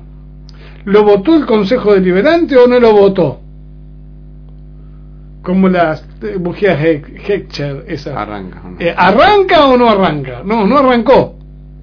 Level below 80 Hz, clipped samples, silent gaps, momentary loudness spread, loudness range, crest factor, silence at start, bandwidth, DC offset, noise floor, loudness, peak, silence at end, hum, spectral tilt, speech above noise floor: -34 dBFS; 0.5%; none; 15 LU; 7 LU; 12 dB; 0 s; 5.4 kHz; under 0.1%; -33 dBFS; -10 LUFS; 0 dBFS; 0 s; 50 Hz at -35 dBFS; -8 dB/octave; 23 dB